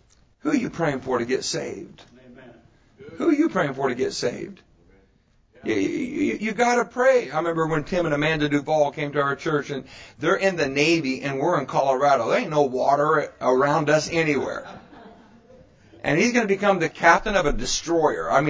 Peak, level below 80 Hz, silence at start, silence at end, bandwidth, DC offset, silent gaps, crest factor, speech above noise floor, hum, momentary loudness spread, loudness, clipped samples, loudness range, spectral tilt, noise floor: -2 dBFS; -48 dBFS; 0.45 s; 0 s; 8 kHz; under 0.1%; none; 20 dB; 39 dB; none; 8 LU; -22 LUFS; under 0.1%; 6 LU; -4.5 dB/octave; -61 dBFS